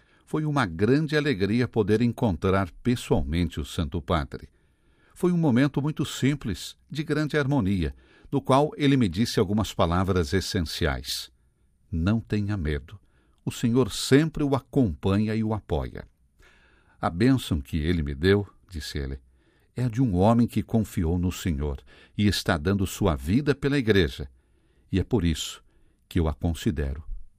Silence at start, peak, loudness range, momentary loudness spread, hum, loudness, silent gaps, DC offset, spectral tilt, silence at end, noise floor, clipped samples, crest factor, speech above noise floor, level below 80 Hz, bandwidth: 0.35 s; -6 dBFS; 3 LU; 12 LU; none; -26 LUFS; none; under 0.1%; -6.5 dB/octave; 0.15 s; -64 dBFS; under 0.1%; 20 dB; 39 dB; -42 dBFS; 15.5 kHz